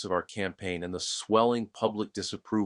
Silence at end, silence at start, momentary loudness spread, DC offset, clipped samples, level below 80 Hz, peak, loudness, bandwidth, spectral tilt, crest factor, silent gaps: 0 s; 0 s; 10 LU; under 0.1%; under 0.1%; -64 dBFS; -10 dBFS; -30 LUFS; 11 kHz; -4 dB/octave; 20 dB; none